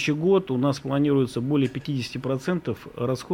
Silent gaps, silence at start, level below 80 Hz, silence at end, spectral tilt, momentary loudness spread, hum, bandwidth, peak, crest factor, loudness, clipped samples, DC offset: none; 0 s; -58 dBFS; 0 s; -7 dB/octave; 8 LU; none; 16 kHz; -10 dBFS; 14 dB; -25 LUFS; under 0.1%; under 0.1%